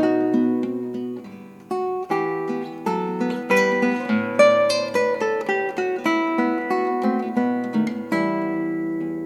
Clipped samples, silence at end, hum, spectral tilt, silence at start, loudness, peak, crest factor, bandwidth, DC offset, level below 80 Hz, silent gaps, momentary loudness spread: under 0.1%; 0 s; none; -5.5 dB/octave; 0 s; -22 LUFS; -4 dBFS; 18 dB; 15 kHz; under 0.1%; -70 dBFS; none; 9 LU